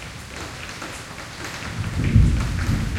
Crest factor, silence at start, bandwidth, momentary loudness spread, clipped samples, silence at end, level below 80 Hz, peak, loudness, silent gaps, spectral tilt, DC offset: 20 dB; 0 s; 15.5 kHz; 15 LU; under 0.1%; 0 s; -28 dBFS; -2 dBFS; -25 LUFS; none; -5.5 dB/octave; under 0.1%